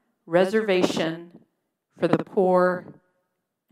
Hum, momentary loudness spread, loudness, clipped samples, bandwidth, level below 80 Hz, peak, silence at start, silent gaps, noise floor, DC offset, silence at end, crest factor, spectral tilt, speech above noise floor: none; 9 LU; -23 LUFS; under 0.1%; 14 kHz; -70 dBFS; -2 dBFS; 0.3 s; none; -78 dBFS; under 0.1%; 0.8 s; 22 dB; -6 dB/octave; 56 dB